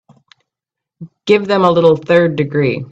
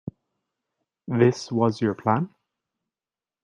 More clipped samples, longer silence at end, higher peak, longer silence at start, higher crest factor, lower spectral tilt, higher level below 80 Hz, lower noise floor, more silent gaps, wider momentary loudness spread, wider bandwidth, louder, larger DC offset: neither; second, 0.05 s vs 1.15 s; first, 0 dBFS vs -4 dBFS; about the same, 1 s vs 1.1 s; second, 14 dB vs 22 dB; about the same, -7.5 dB/octave vs -7.5 dB/octave; first, -54 dBFS vs -66 dBFS; second, -83 dBFS vs under -90 dBFS; neither; second, 5 LU vs 16 LU; second, 7.8 kHz vs 9.8 kHz; first, -13 LUFS vs -23 LUFS; neither